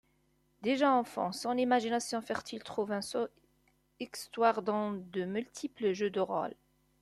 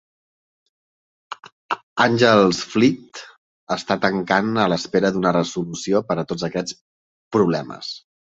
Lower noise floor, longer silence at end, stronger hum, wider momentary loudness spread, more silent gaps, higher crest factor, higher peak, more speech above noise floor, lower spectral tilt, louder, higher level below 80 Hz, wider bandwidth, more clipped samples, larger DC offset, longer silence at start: second, -73 dBFS vs under -90 dBFS; first, 0.5 s vs 0.3 s; neither; second, 12 LU vs 19 LU; second, none vs 1.52-1.69 s, 1.83-1.96 s, 3.38-3.67 s, 6.81-7.31 s; about the same, 20 dB vs 20 dB; second, -14 dBFS vs -2 dBFS; second, 40 dB vs over 71 dB; about the same, -4.5 dB/octave vs -5 dB/octave; second, -33 LUFS vs -20 LUFS; second, -74 dBFS vs -58 dBFS; first, 13.5 kHz vs 8 kHz; neither; neither; second, 0.6 s vs 1.3 s